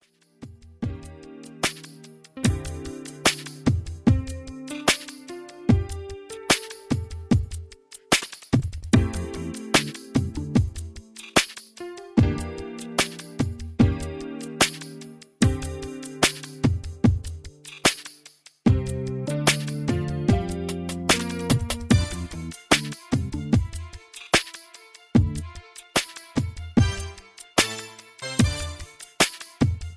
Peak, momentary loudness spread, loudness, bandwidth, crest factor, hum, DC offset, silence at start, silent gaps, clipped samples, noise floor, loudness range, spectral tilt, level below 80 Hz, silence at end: -2 dBFS; 17 LU; -25 LUFS; 11 kHz; 22 dB; none; under 0.1%; 0.4 s; none; under 0.1%; -52 dBFS; 2 LU; -4.5 dB/octave; -38 dBFS; 0 s